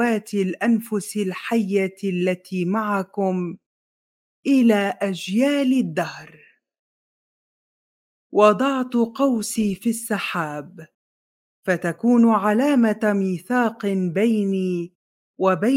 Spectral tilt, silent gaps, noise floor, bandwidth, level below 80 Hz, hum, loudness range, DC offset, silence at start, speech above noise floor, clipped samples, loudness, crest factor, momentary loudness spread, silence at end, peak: -6 dB/octave; 3.66-4.43 s, 6.79-8.30 s, 10.94-11.63 s, 14.95-15.34 s; under -90 dBFS; 16.5 kHz; -66 dBFS; none; 4 LU; under 0.1%; 0 s; over 70 dB; under 0.1%; -21 LUFS; 20 dB; 10 LU; 0 s; -2 dBFS